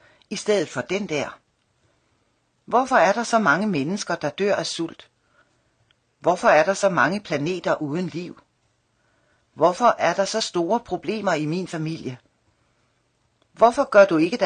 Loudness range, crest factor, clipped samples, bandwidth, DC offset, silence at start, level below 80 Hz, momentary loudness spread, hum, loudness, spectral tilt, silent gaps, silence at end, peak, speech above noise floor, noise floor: 3 LU; 20 dB; under 0.1%; 9.8 kHz; under 0.1%; 0.3 s; -64 dBFS; 13 LU; none; -21 LUFS; -4.5 dB/octave; none; 0 s; -2 dBFS; 47 dB; -68 dBFS